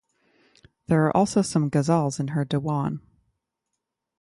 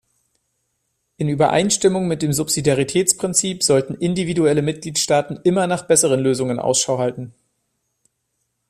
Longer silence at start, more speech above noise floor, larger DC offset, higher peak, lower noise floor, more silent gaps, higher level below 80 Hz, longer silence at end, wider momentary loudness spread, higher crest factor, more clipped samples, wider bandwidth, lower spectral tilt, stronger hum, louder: second, 0.9 s vs 1.2 s; first, 60 dB vs 55 dB; neither; second, -8 dBFS vs 0 dBFS; first, -82 dBFS vs -73 dBFS; neither; about the same, -58 dBFS vs -54 dBFS; second, 1.2 s vs 1.4 s; about the same, 7 LU vs 6 LU; about the same, 18 dB vs 20 dB; neither; second, 11.5 kHz vs 15 kHz; first, -6.5 dB/octave vs -4 dB/octave; neither; second, -24 LUFS vs -18 LUFS